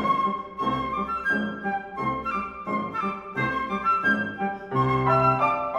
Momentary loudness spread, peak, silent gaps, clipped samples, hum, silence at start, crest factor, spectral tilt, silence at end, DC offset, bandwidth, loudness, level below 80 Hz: 9 LU; -10 dBFS; none; under 0.1%; none; 0 s; 16 dB; -7.5 dB/octave; 0 s; under 0.1%; 11.5 kHz; -25 LUFS; -52 dBFS